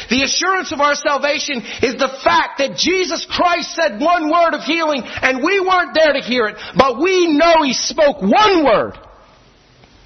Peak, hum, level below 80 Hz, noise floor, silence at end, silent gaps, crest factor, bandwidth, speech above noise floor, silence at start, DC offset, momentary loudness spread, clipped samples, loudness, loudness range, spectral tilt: 0 dBFS; none; -46 dBFS; -48 dBFS; 1.05 s; none; 16 dB; 6.4 kHz; 33 dB; 0 s; under 0.1%; 7 LU; under 0.1%; -15 LUFS; 3 LU; -3 dB/octave